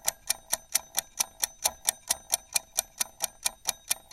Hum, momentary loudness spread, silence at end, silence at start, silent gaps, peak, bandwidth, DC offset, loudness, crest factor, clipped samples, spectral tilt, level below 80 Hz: none; 4 LU; 0.15 s; 0.05 s; none; -2 dBFS; 16.5 kHz; under 0.1%; -29 LUFS; 30 dB; under 0.1%; 2 dB/octave; -62 dBFS